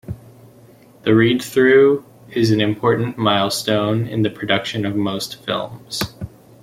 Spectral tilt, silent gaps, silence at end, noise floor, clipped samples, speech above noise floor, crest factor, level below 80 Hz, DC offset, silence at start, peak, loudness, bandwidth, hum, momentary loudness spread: -5.5 dB/octave; none; 0.35 s; -47 dBFS; under 0.1%; 29 dB; 16 dB; -52 dBFS; under 0.1%; 0.1 s; -2 dBFS; -18 LUFS; 16 kHz; none; 14 LU